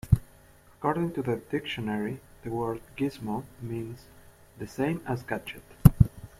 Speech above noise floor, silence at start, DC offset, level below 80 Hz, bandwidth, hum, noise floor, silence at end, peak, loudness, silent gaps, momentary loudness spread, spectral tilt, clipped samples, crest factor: 24 dB; 0.05 s; under 0.1%; -40 dBFS; 16 kHz; none; -56 dBFS; 0.1 s; -2 dBFS; -29 LUFS; none; 17 LU; -7.5 dB/octave; under 0.1%; 26 dB